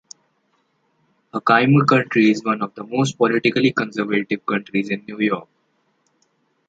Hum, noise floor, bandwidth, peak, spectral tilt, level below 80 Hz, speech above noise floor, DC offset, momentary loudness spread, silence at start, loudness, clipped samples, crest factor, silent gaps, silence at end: none; -66 dBFS; 9 kHz; -2 dBFS; -6 dB/octave; -64 dBFS; 48 dB; under 0.1%; 10 LU; 1.35 s; -19 LUFS; under 0.1%; 18 dB; none; 1.25 s